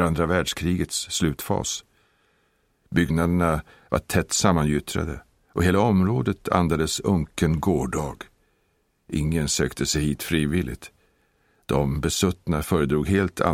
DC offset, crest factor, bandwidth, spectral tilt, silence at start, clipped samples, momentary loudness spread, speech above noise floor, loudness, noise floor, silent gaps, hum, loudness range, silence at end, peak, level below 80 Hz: under 0.1%; 22 dB; 16.5 kHz; -5 dB/octave; 0 s; under 0.1%; 9 LU; 45 dB; -24 LUFS; -68 dBFS; none; none; 3 LU; 0 s; -2 dBFS; -40 dBFS